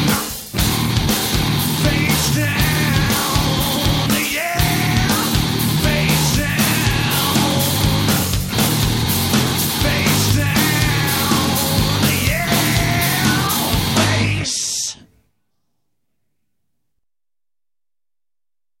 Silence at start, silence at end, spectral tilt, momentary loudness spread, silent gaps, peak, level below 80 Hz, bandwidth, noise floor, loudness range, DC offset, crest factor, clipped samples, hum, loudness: 0 s; 3.85 s; -4 dB/octave; 2 LU; none; -4 dBFS; -30 dBFS; 16.5 kHz; under -90 dBFS; 4 LU; under 0.1%; 14 dB; under 0.1%; none; -16 LUFS